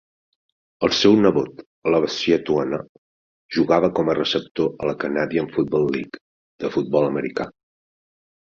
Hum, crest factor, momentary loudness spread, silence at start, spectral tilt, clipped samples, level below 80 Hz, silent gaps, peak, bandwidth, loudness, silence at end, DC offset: none; 20 dB; 12 LU; 0.8 s; -5.5 dB/octave; under 0.1%; -56 dBFS; 1.66-1.82 s, 2.89-3.49 s, 4.51-4.55 s, 6.21-6.59 s; -2 dBFS; 7.4 kHz; -21 LUFS; 0.95 s; under 0.1%